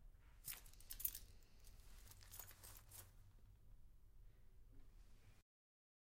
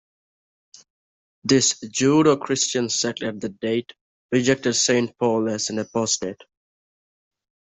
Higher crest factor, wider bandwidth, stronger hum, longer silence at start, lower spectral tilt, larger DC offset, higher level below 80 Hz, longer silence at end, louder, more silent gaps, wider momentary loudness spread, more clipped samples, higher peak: first, 34 dB vs 20 dB; first, 16.5 kHz vs 8.4 kHz; neither; second, 0 s vs 1.45 s; second, -1.5 dB/octave vs -3.5 dB/octave; neither; about the same, -66 dBFS vs -62 dBFS; second, 0.75 s vs 1.3 s; second, -53 LUFS vs -21 LUFS; second, none vs 4.01-4.29 s; first, 21 LU vs 10 LU; neither; second, -26 dBFS vs -4 dBFS